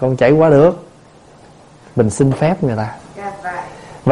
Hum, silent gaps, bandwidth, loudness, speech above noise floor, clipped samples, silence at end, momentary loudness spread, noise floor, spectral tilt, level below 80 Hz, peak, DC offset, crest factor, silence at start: none; none; 11.5 kHz; -15 LUFS; 31 dB; under 0.1%; 0 s; 19 LU; -43 dBFS; -7.5 dB/octave; -46 dBFS; 0 dBFS; under 0.1%; 16 dB; 0 s